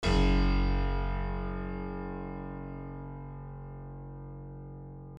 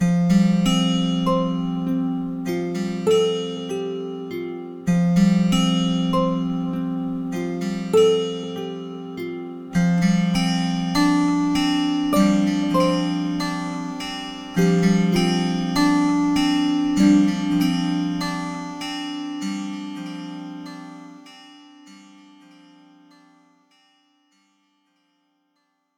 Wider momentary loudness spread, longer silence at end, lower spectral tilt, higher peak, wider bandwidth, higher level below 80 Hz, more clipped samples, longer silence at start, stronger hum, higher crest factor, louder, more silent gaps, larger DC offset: first, 17 LU vs 13 LU; second, 0 s vs 4 s; about the same, -7 dB/octave vs -6 dB/octave; second, -14 dBFS vs -6 dBFS; second, 8.6 kHz vs 15 kHz; first, -34 dBFS vs -48 dBFS; neither; about the same, 0 s vs 0 s; neither; about the same, 18 dB vs 16 dB; second, -35 LUFS vs -21 LUFS; neither; neither